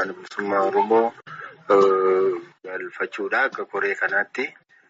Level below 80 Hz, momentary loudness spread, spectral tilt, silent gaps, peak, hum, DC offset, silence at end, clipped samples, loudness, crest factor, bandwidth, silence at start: -72 dBFS; 15 LU; -3 dB/octave; none; -8 dBFS; none; under 0.1%; 0.4 s; under 0.1%; -22 LUFS; 16 dB; 7.8 kHz; 0 s